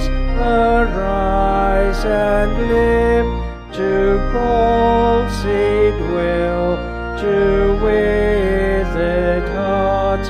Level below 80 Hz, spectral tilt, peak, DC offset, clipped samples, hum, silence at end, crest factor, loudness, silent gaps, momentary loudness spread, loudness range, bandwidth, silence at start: -22 dBFS; -7 dB/octave; -4 dBFS; under 0.1%; under 0.1%; none; 0 s; 12 dB; -16 LUFS; none; 5 LU; 1 LU; 10 kHz; 0 s